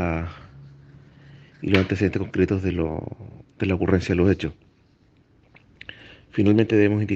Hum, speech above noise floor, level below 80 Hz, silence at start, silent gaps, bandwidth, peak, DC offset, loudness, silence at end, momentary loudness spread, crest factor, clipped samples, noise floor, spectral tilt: none; 37 dB; -50 dBFS; 0 s; none; 7.8 kHz; 0 dBFS; under 0.1%; -22 LUFS; 0 s; 22 LU; 24 dB; under 0.1%; -58 dBFS; -8 dB/octave